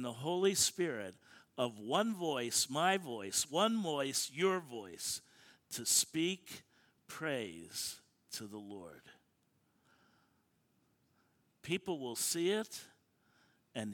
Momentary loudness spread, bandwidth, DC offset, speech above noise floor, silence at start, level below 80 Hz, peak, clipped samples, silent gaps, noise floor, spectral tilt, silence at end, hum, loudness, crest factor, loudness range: 18 LU; 19 kHz; under 0.1%; 40 dB; 0 s; -78 dBFS; -16 dBFS; under 0.1%; none; -77 dBFS; -2.5 dB/octave; 0 s; none; -36 LUFS; 22 dB; 14 LU